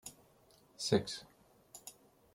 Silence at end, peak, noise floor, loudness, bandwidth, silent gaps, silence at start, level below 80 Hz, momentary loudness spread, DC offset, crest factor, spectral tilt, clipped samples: 0.45 s; -16 dBFS; -67 dBFS; -36 LUFS; 16.5 kHz; none; 0.05 s; -72 dBFS; 20 LU; under 0.1%; 24 dB; -4.5 dB/octave; under 0.1%